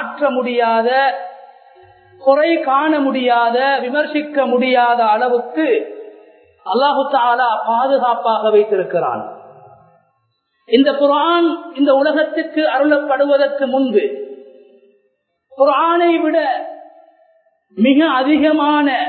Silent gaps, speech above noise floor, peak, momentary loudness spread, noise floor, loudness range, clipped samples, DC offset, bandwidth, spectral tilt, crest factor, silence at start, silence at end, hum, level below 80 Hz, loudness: none; 51 dB; 0 dBFS; 7 LU; -66 dBFS; 3 LU; under 0.1%; under 0.1%; 4.5 kHz; -9.5 dB/octave; 16 dB; 0 s; 0 s; none; -66 dBFS; -15 LUFS